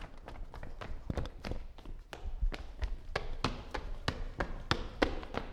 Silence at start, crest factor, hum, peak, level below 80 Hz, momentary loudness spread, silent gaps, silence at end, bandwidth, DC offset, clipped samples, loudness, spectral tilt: 0 s; 28 dB; none; -10 dBFS; -40 dBFS; 15 LU; none; 0 s; 11 kHz; under 0.1%; under 0.1%; -40 LUFS; -5.5 dB/octave